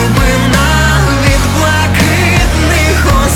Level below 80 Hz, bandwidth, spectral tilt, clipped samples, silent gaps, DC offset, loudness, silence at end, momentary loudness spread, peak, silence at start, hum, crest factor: -14 dBFS; 18 kHz; -4.5 dB/octave; under 0.1%; none; under 0.1%; -9 LUFS; 0 s; 1 LU; 0 dBFS; 0 s; none; 8 dB